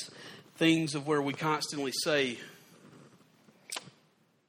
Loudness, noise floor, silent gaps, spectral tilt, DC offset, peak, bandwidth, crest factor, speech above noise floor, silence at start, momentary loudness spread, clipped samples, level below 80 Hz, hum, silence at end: -31 LUFS; -68 dBFS; none; -4 dB/octave; under 0.1%; -12 dBFS; 16.5 kHz; 22 dB; 38 dB; 0 s; 18 LU; under 0.1%; -76 dBFS; none; 0.6 s